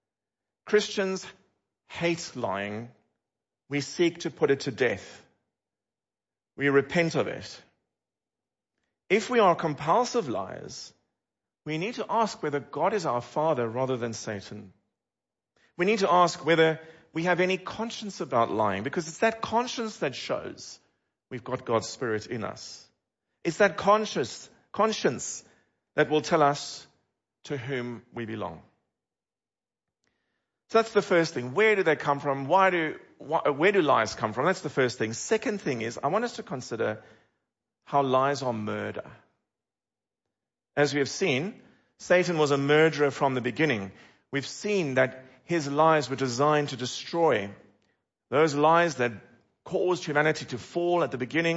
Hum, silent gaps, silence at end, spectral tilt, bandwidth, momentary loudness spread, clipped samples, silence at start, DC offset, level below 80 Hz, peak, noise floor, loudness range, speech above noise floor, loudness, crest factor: none; none; 0 s; -5 dB/octave; 8 kHz; 15 LU; under 0.1%; 0.65 s; under 0.1%; -70 dBFS; -8 dBFS; under -90 dBFS; 6 LU; over 63 dB; -27 LUFS; 20 dB